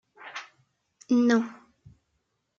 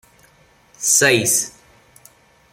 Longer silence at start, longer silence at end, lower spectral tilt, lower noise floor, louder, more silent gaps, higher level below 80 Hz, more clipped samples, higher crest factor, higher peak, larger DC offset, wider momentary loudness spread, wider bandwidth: second, 0.2 s vs 0.8 s; about the same, 1.05 s vs 1.05 s; first, -5 dB/octave vs -1.5 dB/octave; first, -77 dBFS vs -53 dBFS; second, -25 LUFS vs -15 LUFS; neither; second, -74 dBFS vs -60 dBFS; neither; about the same, 20 dB vs 20 dB; second, -10 dBFS vs -2 dBFS; neither; first, 19 LU vs 11 LU; second, 7.4 kHz vs 16.5 kHz